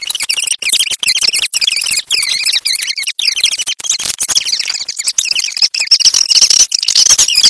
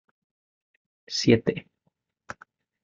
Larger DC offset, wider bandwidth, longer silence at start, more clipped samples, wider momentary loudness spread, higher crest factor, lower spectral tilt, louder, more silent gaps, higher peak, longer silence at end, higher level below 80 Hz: neither; first, 11 kHz vs 7.8 kHz; second, 0 s vs 1.1 s; first, 0.2% vs under 0.1%; second, 8 LU vs 22 LU; second, 12 dB vs 24 dB; second, 4 dB/octave vs -5.5 dB/octave; first, -10 LUFS vs -24 LUFS; neither; first, 0 dBFS vs -6 dBFS; second, 0 s vs 1.25 s; first, -52 dBFS vs -62 dBFS